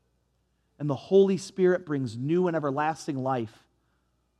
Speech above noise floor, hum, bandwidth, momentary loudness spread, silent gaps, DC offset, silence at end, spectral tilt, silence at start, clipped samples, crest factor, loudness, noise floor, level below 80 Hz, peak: 46 dB; none; 11 kHz; 11 LU; none; under 0.1%; 0.9 s; -7 dB/octave; 0.8 s; under 0.1%; 18 dB; -27 LUFS; -72 dBFS; -74 dBFS; -10 dBFS